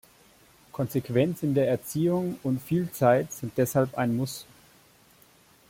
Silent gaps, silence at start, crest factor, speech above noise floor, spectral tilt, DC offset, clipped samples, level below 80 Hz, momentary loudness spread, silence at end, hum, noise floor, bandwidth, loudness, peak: none; 0.75 s; 20 dB; 32 dB; -6.5 dB/octave; under 0.1%; under 0.1%; -62 dBFS; 10 LU; 1.25 s; none; -58 dBFS; 16.5 kHz; -27 LUFS; -8 dBFS